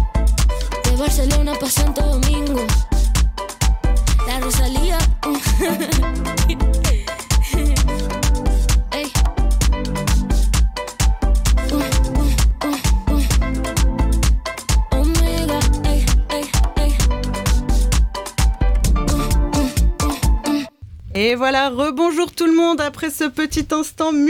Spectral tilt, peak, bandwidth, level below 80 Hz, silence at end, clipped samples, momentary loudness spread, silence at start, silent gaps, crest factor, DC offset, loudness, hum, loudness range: -5 dB/octave; -6 dBFS; 16 kHz; -18 dBFS; 0 s; under 0.1%; 3 LU; 0 s; none; 10 dB; under 0.1%; -19 LUFS; none; 1 LU